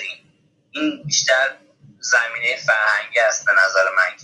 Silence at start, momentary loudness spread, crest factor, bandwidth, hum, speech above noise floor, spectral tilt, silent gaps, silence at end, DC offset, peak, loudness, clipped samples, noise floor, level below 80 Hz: 0 s; 9 LU; 16 dB; 11.5 kHz; none; 41 dB; -1 dB/octave; none; 0 s; under 0.1%; -4 dBFS; -17 LUFS; under 0.1%; -59 dBFS; -72 dBFS